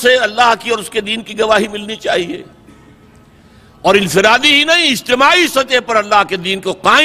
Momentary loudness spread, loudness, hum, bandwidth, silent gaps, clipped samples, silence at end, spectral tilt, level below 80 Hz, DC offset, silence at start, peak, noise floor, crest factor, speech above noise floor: 10 LU; -12 LUFS; none; 16 kHz; none; under 0.1%; 0 s; -2.5 dB/octave; -48 dBFS; under 0.1%; 0 s; 0 dBFS; -43 dBFS; 14 dB; 31 dB